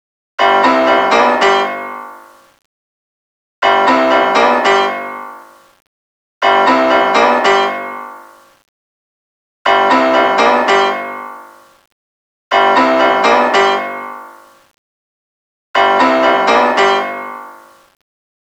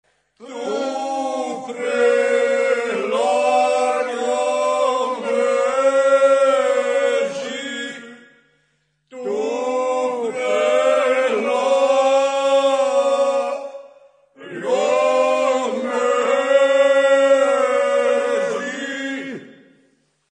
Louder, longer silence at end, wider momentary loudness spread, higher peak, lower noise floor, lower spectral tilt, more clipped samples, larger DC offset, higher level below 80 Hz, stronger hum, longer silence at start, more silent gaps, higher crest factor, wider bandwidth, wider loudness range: first, -11 LUFS vs -18 LUFS; first, 0.95 s vs 0.8 s; first, 17 LU vs 12 LU; first, 0 dBFS vs -4 dBFS; second, -38 dBFS vs -66 dBFS; about the same, -3 dB/octave vs -2.5 dB/octave; neither; neither; first, -56 dBFS vs -74 dBFS; neither; about the same, 0.4 s vs 0.4 s; first, 2.65-3.62 s, 5.87-6.41 s, 8.69-9.65 s, 11.92-12.51 s, 14.78-15.74 s vs none; about the same, 14 dB vs 14 dB; first, over 20 kHz vs 10 kHz; second, 1 LU vs 5 LU